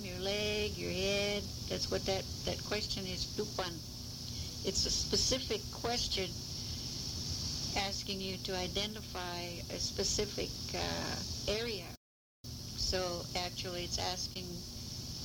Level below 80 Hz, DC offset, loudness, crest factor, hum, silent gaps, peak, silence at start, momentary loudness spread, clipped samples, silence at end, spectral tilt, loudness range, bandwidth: -50 dBFS; under 0.1%; -36 LUFS; 18 dB; none; 11.97-12.44 s; -20 dBFS; 0 s; 9 LU; under 0.1%; 0 s; -3 dB/octave; 3 LU; over 20 kHz